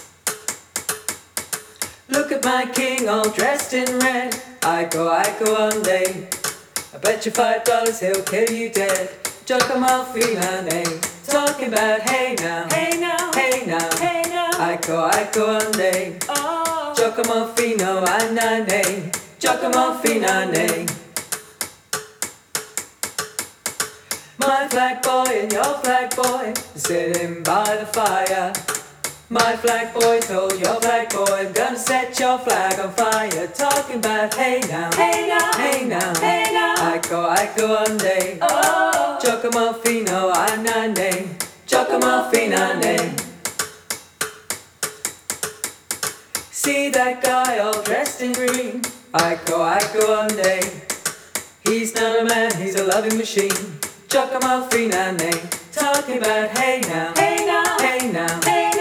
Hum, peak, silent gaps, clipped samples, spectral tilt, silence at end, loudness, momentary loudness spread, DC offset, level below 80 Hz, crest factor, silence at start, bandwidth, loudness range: none; 0 dBFS; none; under 0.1%; -2.5 dB/octave; 0 s; -20 LUFS; 9 LU; under 0.1%; -66 dBFS; 20 dB; 0 s; 19 kHz; 3 LU